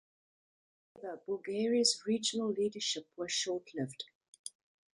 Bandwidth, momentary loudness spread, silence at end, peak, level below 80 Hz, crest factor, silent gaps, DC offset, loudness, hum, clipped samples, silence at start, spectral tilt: 11 kHz; 19 LU; 0.5 s; -16 dBFS; -82 dBFS; 22 dB; 4.15-4.21 s, 4.28-4.33 s, 4.39-4.44 s; under 0.1%; -34 LUFS; none; under 0.1%; 0.95 s; -3 dB/octave